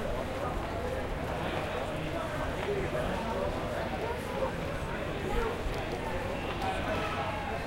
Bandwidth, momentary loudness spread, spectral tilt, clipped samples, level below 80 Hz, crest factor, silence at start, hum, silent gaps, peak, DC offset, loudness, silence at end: 16.5 kHz; 3 LU; -5.5 dB/octave; under 0.1%; -42 dBFS; 14 dB; 0 s; none; none; -18 dBFS; under 0.1%; -34 LUFS; 0 s